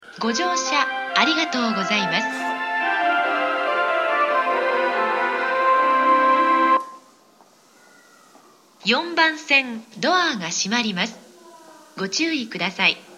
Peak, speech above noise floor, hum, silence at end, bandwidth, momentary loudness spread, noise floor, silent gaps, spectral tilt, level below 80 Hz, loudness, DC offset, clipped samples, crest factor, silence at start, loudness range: -4 dBFS; 32 dB; none; 0 s; 13 kHz; 8 LU; -54 dBFS; none; -2.5 dB/octave; -72 dBFS; -20 LUFS; under 0.1%; under 0.1%; 18 dB; 0.05 s; 4 LU